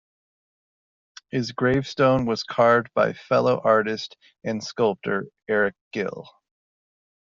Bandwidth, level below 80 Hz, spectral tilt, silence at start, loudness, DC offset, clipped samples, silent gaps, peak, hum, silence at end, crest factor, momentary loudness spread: 7.6 kHz; -58 dBFS; -4.5 dB/octave; 1.35 s; -23 LUFS; under 0.1%; under 0.1%; 5.81-5.91 s; -6 dBFS; none; 1.1 s; 20 dB; 12 LU